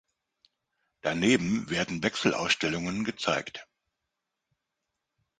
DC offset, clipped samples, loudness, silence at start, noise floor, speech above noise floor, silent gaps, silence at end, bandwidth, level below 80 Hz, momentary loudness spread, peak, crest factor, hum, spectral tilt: under 0.1%; under 0.1%; -28 LUFS; 1.05 s; -85 dBFS; 56 dB; none; 1.75 s; 9.6 kHz; -60 dBFS; 8 LU; -8 dBFS; 22 dB; none; -4 dB/octave